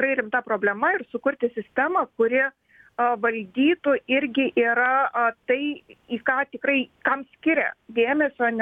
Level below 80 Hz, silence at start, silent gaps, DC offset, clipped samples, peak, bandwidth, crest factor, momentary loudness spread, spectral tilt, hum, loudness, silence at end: -68 dBFS; 0 s; none; under 0.1%; under 0.1%; -6 dBFS; 3.8 kHz; 18 dB; 6 LU; -7 dB/octave; none; -23 LUFS; 0 s